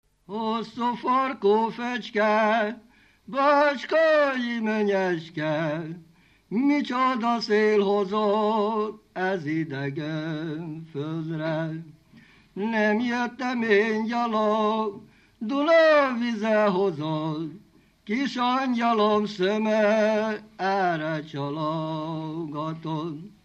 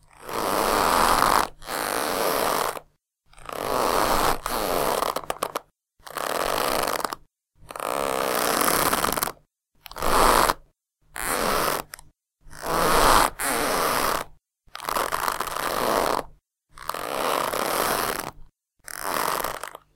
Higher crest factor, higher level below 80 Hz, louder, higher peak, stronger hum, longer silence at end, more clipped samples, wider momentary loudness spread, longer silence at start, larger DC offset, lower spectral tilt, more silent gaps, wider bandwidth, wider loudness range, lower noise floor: second, 16 dB vs 24 dB; second, -70 dBFS vs -40 dBFS; about the same, -25 LUFS vs -24 LUFS; second, -8 dBFS vs 0 dBFS; neither; about the same, 0.15 s vs 0.2 s; neither; second, 11 LU vs 16 LU; about the same, 0.3 s vs 0.2 s; neither; first, -6.5 dB/octave vs -2 dB/octave; neither; second, 8.4 kHz vs 17 kHz; about the same, 6 LU vs 4 LU; second, -54 dBFS vs -61 dBFS